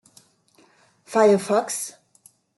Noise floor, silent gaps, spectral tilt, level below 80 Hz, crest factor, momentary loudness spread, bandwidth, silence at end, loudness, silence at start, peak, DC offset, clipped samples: -59 dBFS; none; -4.5 dB/octave; -74 dBFS; 20 dB; 12 LU; 12.5 kHz; 0.7 s; -21 LUFS; 1.1 s; -4 dBFS; under 0.1%; under 0.1%